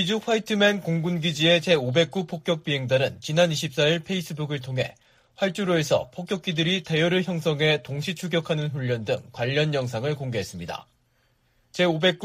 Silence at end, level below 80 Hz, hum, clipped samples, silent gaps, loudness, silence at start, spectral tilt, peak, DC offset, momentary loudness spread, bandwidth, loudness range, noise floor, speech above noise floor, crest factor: 0 s; -62 dBFS; none; under 0.1%; none; -24 LUFS; 0 s; -5 dB/octave; -6 dBFS; under 0.1%; 9 LU; 15.5 kHz; 5 LU; -66 dBFS; 42 dB; 18 dB